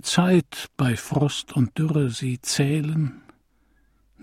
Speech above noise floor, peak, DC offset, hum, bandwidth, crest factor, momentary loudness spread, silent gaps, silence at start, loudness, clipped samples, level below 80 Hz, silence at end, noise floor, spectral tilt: 40 dB; -6 dBFS; under 0.1%; none; 15.5 kHz; 18 dB; 7 LU; none; 0.05 s; -23 LUFS; under 0.1%; -56 dBFS; 1.05 s; -63 dBFS; -5.5 dB/octave